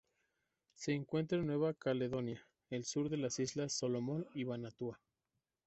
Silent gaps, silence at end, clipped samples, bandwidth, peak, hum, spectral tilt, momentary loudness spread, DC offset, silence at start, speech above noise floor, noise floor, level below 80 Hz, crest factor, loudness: none; 0.7 s; under 0.1%; 8.2 kHz; -24 dBFS; none; -5.5 dB/octave; 9 LU; under 0.1%; 0.8 s; 50 dB; -89 dBFS; -72 dBFS; 16 dB; -40 LUFS